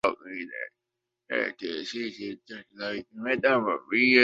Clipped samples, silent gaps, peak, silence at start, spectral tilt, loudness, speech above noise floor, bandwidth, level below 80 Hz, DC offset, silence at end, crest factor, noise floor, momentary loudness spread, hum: under 0.1%; none; -4 dBFS; 0.05 s; -4.5 dB/octave; -29 LUFS; 58 dB; 8 kHz; -70 dBFS; under 0.1%; 0 s; 24 dB; -85 dBFS; 15 LU; none